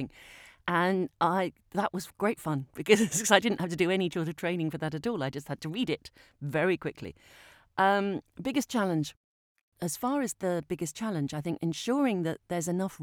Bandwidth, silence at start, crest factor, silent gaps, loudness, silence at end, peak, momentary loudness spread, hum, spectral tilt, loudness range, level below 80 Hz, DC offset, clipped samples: 19.5 kHz; 0 s; 26 dB; 9.17-9.56 s, 9.63-9.72 s; -30 LUFS; 0 s; -6 dBFS; 12 LU; none; -4.5 dB/octave; 5 LU; -66 dBFS; under 0.1%; under 0.1%